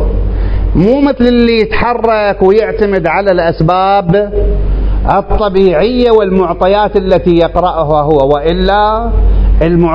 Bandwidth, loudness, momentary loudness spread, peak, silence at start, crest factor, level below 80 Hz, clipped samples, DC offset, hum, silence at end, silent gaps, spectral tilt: 5.4 kHz; -10 LUFS; 5 LU; 0 dBFS; 0 s; 8 dB; -16 dBFS; 0.6%; under 0.1%; none; 0 s; none; -9 dB/octave